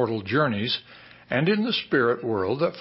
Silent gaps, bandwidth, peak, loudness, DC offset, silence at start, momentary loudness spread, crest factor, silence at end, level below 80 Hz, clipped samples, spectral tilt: none; 5.8 kHz; -10 dBFS; -24 LUFS; under 0.1%; 0 s; 5 LU; 16 dB; 0 s; -58 dBFS; under 0.1%; -10 dB/octave